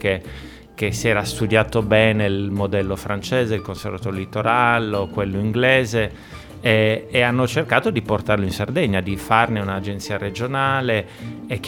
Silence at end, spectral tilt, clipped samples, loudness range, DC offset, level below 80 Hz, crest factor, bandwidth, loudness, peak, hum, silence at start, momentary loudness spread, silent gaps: 0 s; -5.5 dB/octave; under 0.1%; 2 LU; under 0.1%; -44 dBFS; 20 dB; 17.5 kHz; -20 LUFS; 0 dBFS; none; 0 s; 11 LU; none